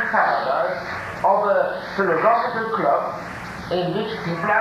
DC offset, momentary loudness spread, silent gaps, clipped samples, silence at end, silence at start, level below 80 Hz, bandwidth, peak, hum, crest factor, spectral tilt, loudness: under 0.1%; 10 LU; none; under 0.1%; 0 s; 0 s; -52 dBFS; 15 kHz; -4 dBFS; none; 16 dB; -6 dB/octave; -21 LUFS